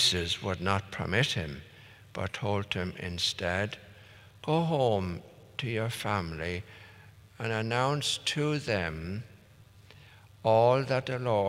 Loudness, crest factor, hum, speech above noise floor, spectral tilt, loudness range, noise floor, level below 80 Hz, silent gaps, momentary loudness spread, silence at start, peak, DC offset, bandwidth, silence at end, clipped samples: -30 LUFS; 22 dB; none; 26 dB; -4.5 dB/octave; 3 LU; -56 dBFS; -60 dBFS; none; 15 LU; 0 s; -10 dBFS; under 0.1%; 16 kHz; 0 s; under 0.1%